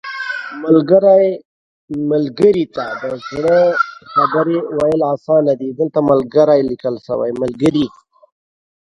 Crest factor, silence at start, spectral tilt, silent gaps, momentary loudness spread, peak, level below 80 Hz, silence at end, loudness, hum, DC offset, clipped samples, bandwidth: 14 dB; 0.05 s; -7.5 dB/octave; 1.45-1.88 s; 12 LU; 0 dBFS; -54 dBFS; 1.1 s; -15 LUFS; none; under 0.1%; under 0.1%; 10.5 kHz